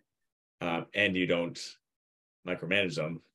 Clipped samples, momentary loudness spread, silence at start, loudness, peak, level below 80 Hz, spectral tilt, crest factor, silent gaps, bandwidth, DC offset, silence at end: under 0.1%; 14 LU; 0.6 s; -31 LUFS; -10 dBFS; -72 dBFS; -5 dB/octave; 24 dB; 1.96-2.43 s; 12 kHz; under 0.1%; 0.15 s